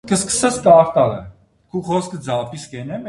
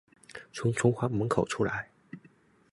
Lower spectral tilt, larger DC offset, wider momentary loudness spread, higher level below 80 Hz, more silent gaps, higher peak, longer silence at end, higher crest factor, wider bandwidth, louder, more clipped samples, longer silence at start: second, -4.5 dB/octave vs -6 dB/octave; neither; second, 18 LU vs 23 LU; first, -50 dBFS vs -58 dBFS; neither; first, 0 dBFS vs -10 dBFS; second, 0 s vs 0.55 s; about the same, 18 dB vs 22 dB; about the same, 11.5 kHz vs 11.5 kHz; first, -16 LUFS vs -30 LUFS; neither; second, 0.05 s vs 0.35 s